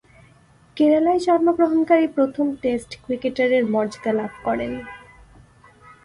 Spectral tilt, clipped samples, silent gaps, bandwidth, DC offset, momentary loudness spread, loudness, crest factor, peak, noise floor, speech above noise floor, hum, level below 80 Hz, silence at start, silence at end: -6 dB/octave; under 0.1%; none; 11 kHz; under 0.1%; 10 LU; -20 LUFS; 16 dB; -4 dBFS; -53 dBFS; 33 dB; none; -54 dBFS; 0.75 s; 1.05 s